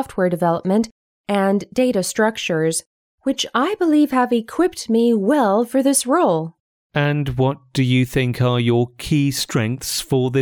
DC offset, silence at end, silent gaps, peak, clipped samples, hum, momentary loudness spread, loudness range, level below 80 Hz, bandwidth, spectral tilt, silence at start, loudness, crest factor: under 0.1%; 0 s; 0.91-1.24 s, 2.86-3.18 s, 6.60-6.90 s; -4 dBFS; under 0.1%; none; 6 LU; 3 LU; -48 dBFS; 19.5 kHz; -5.5 dB/octave; 0 s; -19 LUFS; 14 dB